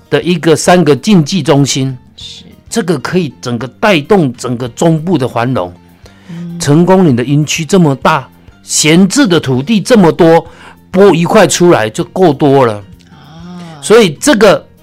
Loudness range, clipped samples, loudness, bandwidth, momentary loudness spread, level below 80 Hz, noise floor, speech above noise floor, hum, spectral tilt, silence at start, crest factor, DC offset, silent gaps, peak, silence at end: 5 LU; 0.6%; -9 LUFS; 16 kHz; 12 LU; -42 dBFS; -37 dBFS; 29 dB; none; -5 dB/octave; 0.1 s; 10 dB; under 0.1%; none; 0 dBFS; 0.2 s